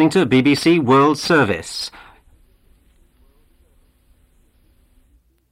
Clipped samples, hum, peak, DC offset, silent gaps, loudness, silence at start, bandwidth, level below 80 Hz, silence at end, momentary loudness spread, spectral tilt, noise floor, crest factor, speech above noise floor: under 0.1%; none; -4 dBFS; under 0.1%; none; -16 LUFS; 0 s; 15.5 kHz; -52 dBFS; 3.65 s; 13 LU; -5.5 dB/octave; -57 dBFS; 16 dB; 42 dB